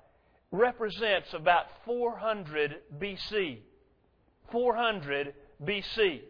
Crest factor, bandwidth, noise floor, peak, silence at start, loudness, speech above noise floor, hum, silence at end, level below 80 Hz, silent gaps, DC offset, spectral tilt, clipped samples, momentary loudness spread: 20 dB; 5.4 kHz; -68 dBFS; -10 dBFS; 0.5 s; -31 LUFS; 37 dB; none; 0 s; -60 dBFS; none; under 0.1%; -6 dB/octave; under 0.1%; 11 LU